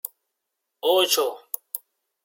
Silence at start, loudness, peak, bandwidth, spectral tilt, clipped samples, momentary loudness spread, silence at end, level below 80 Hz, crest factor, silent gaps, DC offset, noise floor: 0.85 s; -23 LUFS; -6 dBFS; 17 kHz; 0 dB/octave; under 0.1%; 16 LU; 0.45 s; -88 dBFS; 20 dB; none; under 0.1%; -81 dBFS